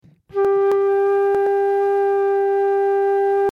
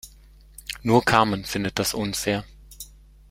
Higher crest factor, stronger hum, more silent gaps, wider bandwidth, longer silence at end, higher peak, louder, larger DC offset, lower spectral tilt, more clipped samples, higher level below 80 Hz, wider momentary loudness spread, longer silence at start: second, 6 dB vs 24 dB; neither; neither; second, 4.2 kHz vs 16 kHz; second, 0.05 s vs 0.45 s; second, -10 dBFS vs -2 dBFS; first, -18 LUFS vs -23 LUFS; neither; first, -6.5 dB/octave vs -4 dB/octave; neither; second, -62 dBFS vs -48 dBFS; second, 1 LU vs 23 LU; first, 0.35 s vs 0.05 s